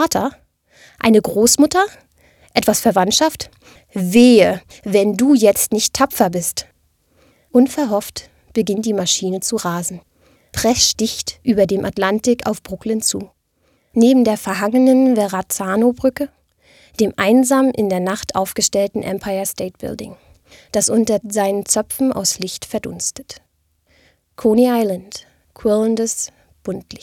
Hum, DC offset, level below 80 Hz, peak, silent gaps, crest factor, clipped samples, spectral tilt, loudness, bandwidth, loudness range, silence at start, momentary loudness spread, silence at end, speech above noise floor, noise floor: none; under 0.1%; -50 dBFS; 0 dBFS; none; 16 dB; under 0.1%; -3.5 dB/octave; -16 LUFS; 18 kHz; 5 LU; 0 s; 15 LU; 0.05 s; 46 dB; -62 dBFS